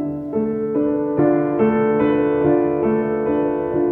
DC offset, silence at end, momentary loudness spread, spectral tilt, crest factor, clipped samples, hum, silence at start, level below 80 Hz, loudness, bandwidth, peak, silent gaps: under 0.1%; 0 s; 4 LU; -11 dB/octave; 12 dB; under 0.1%; none; 0 s; -48 dBFS; -19 LUFS; 3.7 kHz; -6 dBFS; none